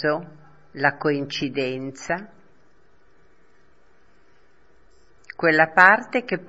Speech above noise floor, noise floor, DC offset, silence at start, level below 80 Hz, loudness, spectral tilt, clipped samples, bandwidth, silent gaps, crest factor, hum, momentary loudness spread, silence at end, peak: 39 dB; -60 dBFS; 0.3%; 0 s; -62 dBFS; -20 LUFS; -5 dB/octave; under 0.1%; 8 kHz; none; 24 dB; none; 15 LU; 0.05 s; 0 dBFS